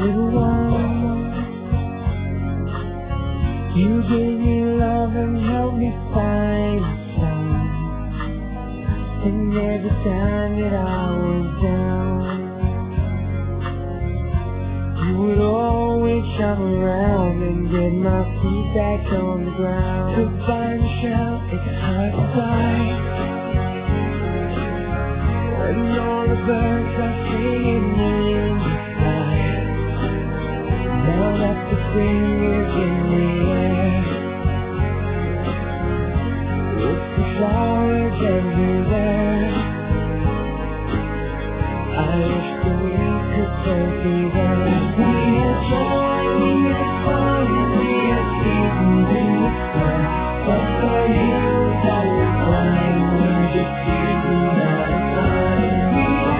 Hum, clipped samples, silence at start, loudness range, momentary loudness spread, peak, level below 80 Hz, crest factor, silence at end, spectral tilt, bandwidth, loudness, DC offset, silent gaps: none; under 0.1%; 0 s; 4 LU; 7 LU; -6 dBFS; -28 dBFS; 14 dB; 0 s; -12 dB/octave; 4 kHz; -20 LUFS; under 0.1%; none